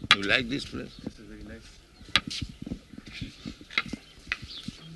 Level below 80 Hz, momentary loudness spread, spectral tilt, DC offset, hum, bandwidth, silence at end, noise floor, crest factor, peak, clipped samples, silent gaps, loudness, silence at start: -50 dBFS; 19 LU; -3 dB/octave; under 0.1%; none; 12 kHz; 0 s; -51 dBFS; 30 dB; -2 dBFS; under 0.1%; none; -30 LUFS; 0 s